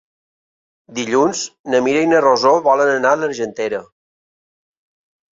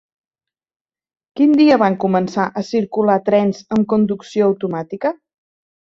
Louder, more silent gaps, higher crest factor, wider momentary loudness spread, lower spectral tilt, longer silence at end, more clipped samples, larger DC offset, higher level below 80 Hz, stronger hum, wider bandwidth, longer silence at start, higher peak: about the same, -16 LUFS vs -17 LUFS; first, 1.59-1.64 s vs none; about the same, 16 dB vs 16 dB; about the same, 12 LU vs 11 LU; second, -3.5 dB/octave vs -7.5 dB/octave; first, 1.55 s vs 0.8 s; neither; neither; about the same, -62 dBFS vs -62 dBFS; neither; about the same, 7.8 kHz vs 7.6 kHz; second, 0.9 s vs 1.35 s; about the same, -2 dBFS vs -2 dBFS